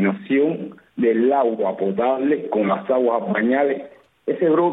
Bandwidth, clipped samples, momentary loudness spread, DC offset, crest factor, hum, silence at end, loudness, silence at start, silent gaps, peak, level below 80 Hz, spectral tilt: 4 kHz; under 0.1%; 9 LU; under 0.1%; 14 dB; none; 0 s; -20 LUFS; 0 s; none; -6 dBFS; -68 dBFS; -10 dB/octave